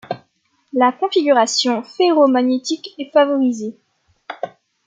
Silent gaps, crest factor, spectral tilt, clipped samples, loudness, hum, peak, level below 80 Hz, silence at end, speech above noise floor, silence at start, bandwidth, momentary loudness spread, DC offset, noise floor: none; 16 dB; -3 dB/octave; under 0.1%; -17 LUFS; none; -2 dBFS; -74 dBFS; 0.4 s; 48 dB; 0.1 s; 9.4 kHz; 17 LU; under 0.1%; -64 dBFS